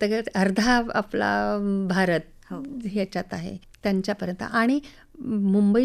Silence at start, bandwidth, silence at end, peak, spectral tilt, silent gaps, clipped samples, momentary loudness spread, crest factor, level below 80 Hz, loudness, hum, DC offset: 0 s; 13 kHz; 0 s; -10 dBFS; -6 dB/octave; none; under 0.1%; 13 LU; 14 dB; -50 dBFS; -25 LUFS; none; under 0.1%